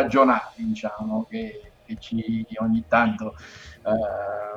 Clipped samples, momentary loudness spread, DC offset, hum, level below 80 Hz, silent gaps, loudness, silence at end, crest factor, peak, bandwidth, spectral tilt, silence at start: under 0.1%; 18 LU; under 0.1%; none; -54 dBFS; none; -25 LUFS; 0 s; 20 dB; -4 dBFS; 7.6 kHz; -7 dB/octave; 0 s